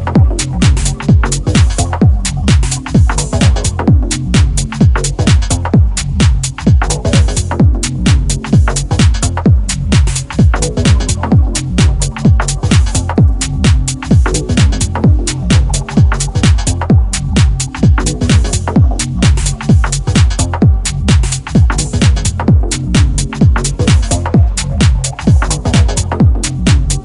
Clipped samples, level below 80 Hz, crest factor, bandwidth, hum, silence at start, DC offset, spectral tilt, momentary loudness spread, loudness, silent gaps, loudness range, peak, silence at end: under 0.1%; -14 dBFS; 10 dB; 11.5 kHz; none; 0 s; under 0.1%; -5 dB/octave; 2 LU; -12 LUFS; none; 0 LU; 0 dBFS; 0 s